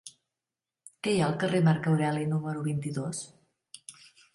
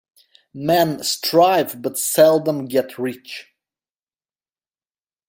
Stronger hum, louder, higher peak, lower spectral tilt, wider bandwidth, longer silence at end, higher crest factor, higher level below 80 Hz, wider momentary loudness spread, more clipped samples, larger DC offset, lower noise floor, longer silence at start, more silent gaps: neither; second, -29 LUFS vs -18 LUFS; second, -12 dBFS vs -2 dBFS; first, -6 dB/octave vs -4 dB/octave; second, 11.5 kHz vs 16.5 kHz; second, 0.45 s vs 1.85 s; about the same, 18 dB vs 18 dB; about the same, -66 dBFS vs -64 dBFS; first, 22 LU vs 13 LU; neither; neither; about the same, under -90 dBFS vs under -90 dBFS; second, 0.05 s vs 0.55 s; neither